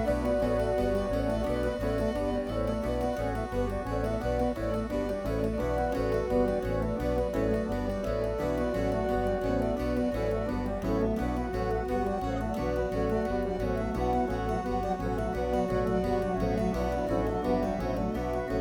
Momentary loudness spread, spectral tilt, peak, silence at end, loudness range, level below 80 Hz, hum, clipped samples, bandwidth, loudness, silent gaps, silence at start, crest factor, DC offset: 3 LU; -7.5 dB/octave; -14 dBFS; 0 s; 1 LU; -38 dBFS; none; under 0.1%; 18.5 kHz; -30 LUFS; none; 0 s; 16 dB; under 0.1%